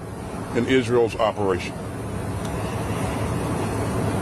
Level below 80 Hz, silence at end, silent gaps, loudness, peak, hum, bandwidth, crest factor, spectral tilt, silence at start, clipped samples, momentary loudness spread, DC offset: -40 dBFS; 0 s; none; -24 LUFS; -8 dBFS; none; 13.5 kHz; 16 dB; -6 dB/octave; 0 s; under 0.1%; 10 LU; under 0.1%